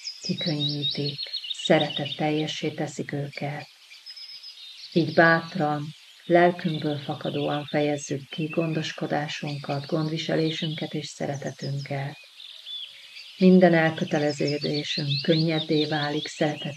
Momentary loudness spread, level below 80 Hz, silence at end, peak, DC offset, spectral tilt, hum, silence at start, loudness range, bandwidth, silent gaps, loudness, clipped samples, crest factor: 19 LU; -76 dBFS; 0 s; -6 dBFS; under 0.1%; -5.5 dB/octave; none; 0 s; 7 LU; 12.5 kHz; none; -25 LUFS; under 0.1%; 20 dB